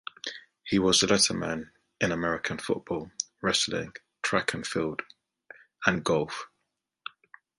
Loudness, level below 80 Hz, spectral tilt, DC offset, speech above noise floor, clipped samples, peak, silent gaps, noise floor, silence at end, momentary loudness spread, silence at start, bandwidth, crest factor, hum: -28 LUFS; -58 dBFS; -3 dB/octave; under 0.1%; 53 dB; under 0.1%; -6 dBFS; none; -81 dBFS; 1.15 s; 20 LU; 0.25 s; 11.5 kHz; 24 dB; none